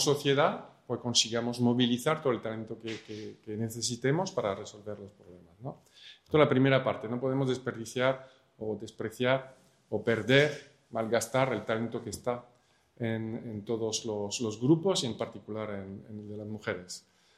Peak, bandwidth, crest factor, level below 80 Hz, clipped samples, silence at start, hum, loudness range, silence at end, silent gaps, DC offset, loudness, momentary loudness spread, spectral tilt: -6 dBFS; 14.5 kHz; 24 dB; -70 dBFS; under 0.1%; 0 s; none; 4 LU; 0.4 s; none; under 0.1%; -31 LUFS; 17 LU; -4.5 dB/octave